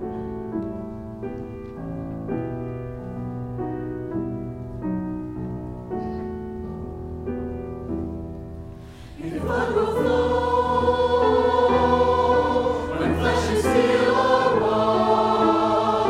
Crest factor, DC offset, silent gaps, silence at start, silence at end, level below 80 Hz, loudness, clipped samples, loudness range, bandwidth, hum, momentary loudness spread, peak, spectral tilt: 18 dB; under 0.1%; none; 0 s; 0 s; -40 dBFS; -23 LUFS; under 0.1%; 12 LU; 14 kHz; none; 15 LU; -6 dBFS; -6.5 dB/octave